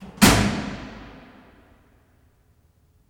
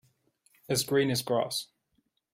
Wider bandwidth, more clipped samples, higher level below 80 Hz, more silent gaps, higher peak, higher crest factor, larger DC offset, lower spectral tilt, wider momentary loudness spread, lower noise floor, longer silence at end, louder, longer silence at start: first, over 20 kHz vs 16 kHz; neither; first, -38 dBFS vs -66 dBFS; neither; first, -4 dBFS vs -14 dBFS; about the same, 22 dB vs 18 dB; neither; about the same, -4 dB/octave vs -4 dB/octave; first, 27 LU vs 8 LU; second, -60 dBFS vs -75 dBFS; first, 2 s vs 0.7 s; first, -19 LUFS vs -29 LUFS; second, 0 s vs 0.7 s